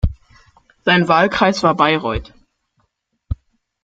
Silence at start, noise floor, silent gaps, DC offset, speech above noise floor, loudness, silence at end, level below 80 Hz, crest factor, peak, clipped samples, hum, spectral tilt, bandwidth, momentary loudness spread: 0.05 s; -68 dBFS; none; under 0.1%; 53 dB; -16 LUFS; 0.5 s; -32 dBFS; 18 dB; 0 dBFS; under 0.1%; none; -5.5 dB/octave; 7.8 kHz; 17 LU